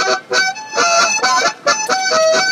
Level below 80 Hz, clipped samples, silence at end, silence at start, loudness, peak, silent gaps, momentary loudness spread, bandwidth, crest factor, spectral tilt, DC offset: -74 dBFS; under 0.1%; 0 s; 0 s; -14 LUFS; -2 dBFS; none; 4 LU; 14.5 kHz; 14 dB; 0.5 dB/octave; under 0.1%